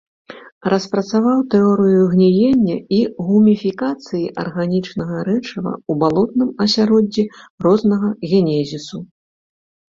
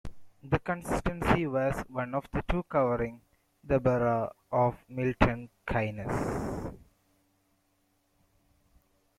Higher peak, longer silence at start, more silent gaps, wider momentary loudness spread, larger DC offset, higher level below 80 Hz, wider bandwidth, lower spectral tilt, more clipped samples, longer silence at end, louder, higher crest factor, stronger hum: first, -2 dBFS vs -6 dBFS; first, 0.3 s vs 0.05 s; first, 0.52-0.61 s, 7.50-7.58 s vs none; first, 11 LU vs 8 LU; neither; second, -54 dBFS vs -44 dBFS; second, 7.4 kHz vs 14.5 kHz; about the same, -7 dB/octave vs -7.5 dB/octave; neither; second, 0.85 s vs 2.4 s; first, -17 LUFS vs -31 LUFS; second, 14 dB vs 26 dB; neither